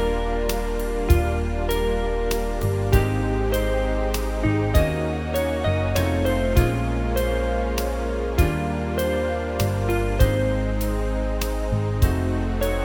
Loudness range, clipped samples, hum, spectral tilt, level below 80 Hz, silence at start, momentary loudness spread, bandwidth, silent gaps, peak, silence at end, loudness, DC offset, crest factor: 1 LU; under 0.1%; none; -6.5 dB/octave; -26 dBFS; 0 s; 5 LU; 19 kHz; none; -4 dBFS; 0 s; -23 LUFS; under 0.1%; 18 dB